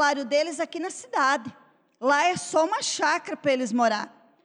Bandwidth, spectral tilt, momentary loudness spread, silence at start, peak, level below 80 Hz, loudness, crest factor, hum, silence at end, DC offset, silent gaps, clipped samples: 11 kHz; -2.5 dB/octave; 8 LU; 0 s; -12 dBFS; -80 dBFS; -25 LUFS; 14 dB; none; 0.35 s; under 0.1%; none; under 0.1%